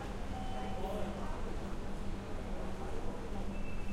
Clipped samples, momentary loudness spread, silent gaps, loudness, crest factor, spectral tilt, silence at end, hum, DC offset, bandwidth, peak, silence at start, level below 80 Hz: under 0.1%; 3 LU; none; -43 LUFS; 12 dB; -6.5 dB/octave; 0 s; none; under 0.1%; 12.5 kHz; -24 dBFS; 0 s; -42 dBFS